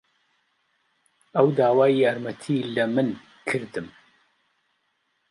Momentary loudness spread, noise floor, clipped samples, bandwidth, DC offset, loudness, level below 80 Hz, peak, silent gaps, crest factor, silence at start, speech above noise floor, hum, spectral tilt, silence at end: 15 LU; -72 dBFS; under 0.1%; 11.5 kHz; under 0.1%; -23 LUFS; -70 dBFS; -6 dBFS; none; 18 dB; 1.35 s; 50 dB; none; -7 dB/octave; 1.4 s